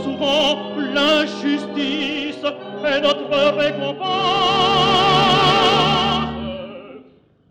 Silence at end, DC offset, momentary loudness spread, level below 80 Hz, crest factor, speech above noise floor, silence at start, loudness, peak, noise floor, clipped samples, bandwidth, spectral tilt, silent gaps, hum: 0.5 s; under 0.1%; 12 LU; -46 dBFS; 14 dB; 31 dB; 0 s; -17 LUFS; -4 dBFS; -50 dBFS; under 0.1%; over 20 kHz; -4.5 dB/octave; none; none